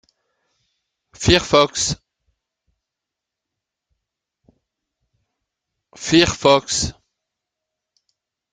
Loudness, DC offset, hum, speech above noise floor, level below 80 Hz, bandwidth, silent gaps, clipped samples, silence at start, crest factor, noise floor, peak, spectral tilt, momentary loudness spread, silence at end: -17 LUFS; under 0.1%; none; 68 dB; -44 dBFS; 9.6 kHz; none; under 0.1%; 1.2 s; 22 dB; -84 dBFS; 0 dBFS; -3.5 dB/octave; 12 LU; 1.6 s